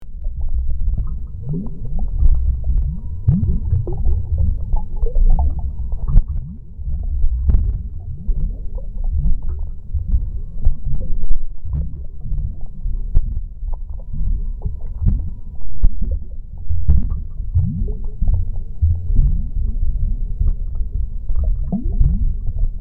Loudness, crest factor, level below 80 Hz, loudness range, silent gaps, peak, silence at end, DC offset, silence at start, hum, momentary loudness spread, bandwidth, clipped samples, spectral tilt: -24 LUFS; 16 dB; -18 dBFS; 5 LU; none; 0 dBFS; 0 s; under 0.1%; 0 s; none; 10 LU; 1.3 kHz; under 0.1%; -13.5 dB/octave